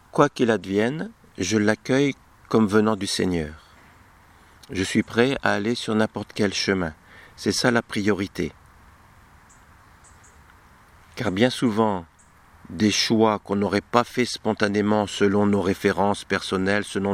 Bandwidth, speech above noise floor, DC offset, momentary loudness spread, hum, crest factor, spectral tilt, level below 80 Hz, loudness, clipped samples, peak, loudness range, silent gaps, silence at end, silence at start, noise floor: 15 kHz; 31 dB; under 0.1%; 9 LU; none; 24 dB; -5 dB/octave; -54 dBFS; -23 LUFS; under 0.1%; 0 dBFS; 6 LU; none; 0 s; 0.15 s; -53 dBFS